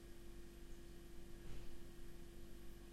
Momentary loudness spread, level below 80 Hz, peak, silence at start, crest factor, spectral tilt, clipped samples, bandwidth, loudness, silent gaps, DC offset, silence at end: 2 LU; -56 dBFS; -38 dBFS; 0 s; 12 dB; -5 dB/octave; under 0.1%; 16 kHz; -60 LUFS; none; under 0.1%; 0 s